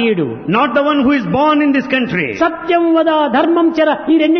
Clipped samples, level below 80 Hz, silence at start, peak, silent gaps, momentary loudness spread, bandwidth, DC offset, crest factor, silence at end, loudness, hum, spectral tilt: under 0.1%; -50 dBFS; 0 s; -2 dBFS; none; 4 LU; 6.2 kHz; under 0.1%; 12 dB; 0 s; -13 LUFS; none; -7 dB/octave